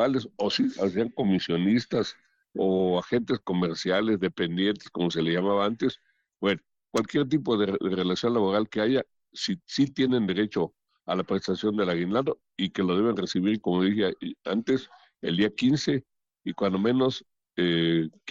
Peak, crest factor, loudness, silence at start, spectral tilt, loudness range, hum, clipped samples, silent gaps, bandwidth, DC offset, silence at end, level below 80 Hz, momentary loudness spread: -14 dBFS; 12 dB; -27 LUFS; 0 s; -6 dB/octave; 1 LU; none; under 0.1%; none; 8.4 kHz; under 0.1%; 0 s; -64 dBFS; 7 LU